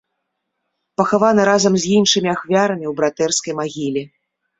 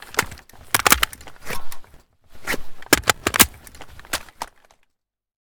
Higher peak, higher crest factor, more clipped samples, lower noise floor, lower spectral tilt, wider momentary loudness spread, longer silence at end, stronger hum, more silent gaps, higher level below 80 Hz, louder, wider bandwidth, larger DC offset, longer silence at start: about the same, -2 dBFS vs 0 dBFS; second, 16 dB vs 24 dB; neither; about the same, -75 dBFS vs -74 dBFS; first, -4 dB/octave vs -1.5 dB/octave; second, 10 LU vs 20 LU; second, 0.5 s vs 1 s; neither; neither; second, -58 dBFS vs -40 dBFS; about the same, -17 LUFS vs -19 LUFS; second, 8.2 kHz vs over 20 kHz; neither; first, 1 s vs 0.05 s